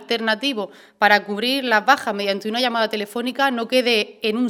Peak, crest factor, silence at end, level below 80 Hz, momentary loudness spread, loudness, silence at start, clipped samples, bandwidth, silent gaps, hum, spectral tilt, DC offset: 0 dBFS; 20 dB; 0 s; -72 dBFS; 8 LU; -20 LUFS; 0 s; under 0.1%; 17 kHz; none; none; -3.5 dB/octave; under 0.1%